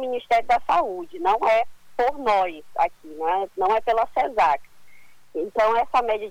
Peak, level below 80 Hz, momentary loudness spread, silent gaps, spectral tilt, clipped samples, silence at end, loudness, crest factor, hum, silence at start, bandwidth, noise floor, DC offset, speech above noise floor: -8 dBFS; -52 dBFS; 8 LU; none; -4 dB/octave; under 0.1%; 0 s; -23 LUFS; 14 dB; none; 0 s; 19 kHz; -54 dBFS; under 0.1%; 32 dB